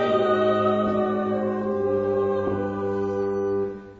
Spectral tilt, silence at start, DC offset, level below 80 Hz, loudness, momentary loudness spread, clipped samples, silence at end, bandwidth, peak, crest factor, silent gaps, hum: -8 dB/octave; 0 s; under 0.1%; -56 dBFS; -24 LUFS; 6 LU; under 0.1%; 0 s; 7.2 kHz; -10 dBFS; 12 dB; none; none